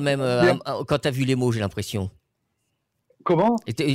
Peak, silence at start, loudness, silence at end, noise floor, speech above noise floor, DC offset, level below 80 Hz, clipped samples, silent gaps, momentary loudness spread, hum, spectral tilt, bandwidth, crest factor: -10 dBFS; 0 s; -23 LUFS; 0 s; -75 dBFS; 53 dB; under 0.1%; -54 dBFS; under 0.1%; none; 10 LU; none; -6 dB/octave; 16 kHz; 14 dB